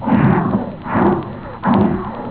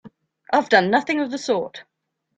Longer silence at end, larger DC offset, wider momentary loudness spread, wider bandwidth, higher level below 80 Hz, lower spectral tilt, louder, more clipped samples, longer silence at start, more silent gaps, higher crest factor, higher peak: second, 0 s vs 0.55 s; first, 0.4% vs under 0.1%; about the same, 9 LU vs 8 LU; second, 4 kHz vs 9.2 kHz; first, -38 dBFS vs -68 dBFS; first, -12.5 dB/octave vs -4.5 dB/octave; first, -17 LUFS vs -20 LUFS; neither; about the same, 0 s vs 0.05 s; neither; second, 14 dB vs 20 dB; about the same, -2 dBFS vs -2 dBFS